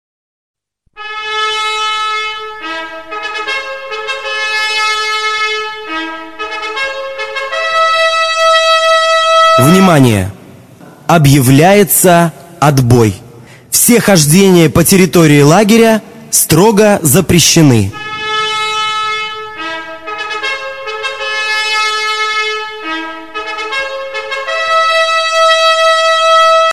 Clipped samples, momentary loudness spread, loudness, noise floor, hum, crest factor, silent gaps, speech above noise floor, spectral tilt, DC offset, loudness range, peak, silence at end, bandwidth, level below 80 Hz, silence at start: 0.2%; 14 LU; -10 LUFS; -36 dBFS; none; 10 dB; none; 29 dB; -4 dB/octave; 0.9%; 9 LU; 0 dBFS; 0 s; 19.5 kHz; -40 dBFS; 0.95 s